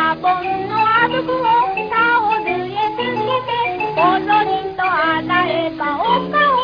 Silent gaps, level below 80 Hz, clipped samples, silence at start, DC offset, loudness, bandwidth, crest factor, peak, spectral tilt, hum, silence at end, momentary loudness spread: none; -52 dBFS; under 0.1%; 0 s; under 0.1%; -17 LUFS; 5.2 kHz; 14 dB; -4 dBFS; -6.5 dB/octave; none; 0 s; 6 LU